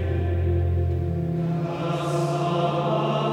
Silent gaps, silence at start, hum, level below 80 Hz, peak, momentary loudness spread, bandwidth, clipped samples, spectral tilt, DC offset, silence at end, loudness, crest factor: none; 0 s; none; -38 dBFS; -10 dBFS; 3 LU; 10.5 kHz; under 0.1%; -7.5 dB/octave; under 0.1%; 0 s; -25 LUFS; 12 dB